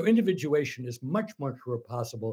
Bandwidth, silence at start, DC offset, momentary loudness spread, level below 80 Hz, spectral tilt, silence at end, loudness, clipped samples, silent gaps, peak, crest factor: 16 kHz; 0 s; under 0.1%; 11 LU; -74 dBFS; -6.5 dB/octave; 0 s; -30 LUFS; under 0.1%; none; -12 dBFS; 18 dB